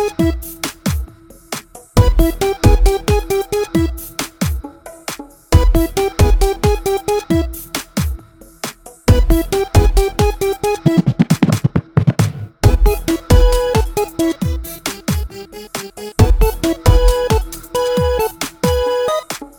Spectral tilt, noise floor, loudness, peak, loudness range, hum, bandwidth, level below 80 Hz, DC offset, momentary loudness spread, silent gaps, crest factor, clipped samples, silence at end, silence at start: -6 dB/octave; -35 dBFS; -16 LUFS; 0 dBFS; 3 LU; none; over 20 kHz; -20 dBFS; under 0.1%; 14 LU; none; 14 dB; under 0.1%; 0.1 s; 0 s